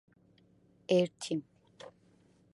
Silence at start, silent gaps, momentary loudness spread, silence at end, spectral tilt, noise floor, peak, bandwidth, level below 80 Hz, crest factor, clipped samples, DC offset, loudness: 0.9 s; none; 24 LU; 0.65 s; -5.5 dB/octave; -66 dBFS; -14 dBFS; 11.5 kHz; -80 dBFS; 22 dB; under 0.1%; under 0.1%; -33 LUFS